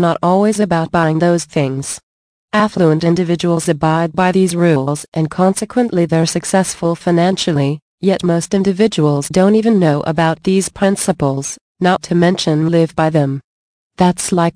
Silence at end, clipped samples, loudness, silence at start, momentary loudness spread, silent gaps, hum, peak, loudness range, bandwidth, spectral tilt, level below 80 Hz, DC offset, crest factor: 0.05 s; under 0.1%; -15 LUFS; 0 s; 6 LU; 2.03-2.48 s, 5.08-5.12 s, 7.82-7.98 s, 11.61-11.75 s, 13.44-13.90 s; none; -2 dBFS; 1 LU; 10.5 kHz; -6 dB/octave; -48 dBFS; under 0.1%; 12 dB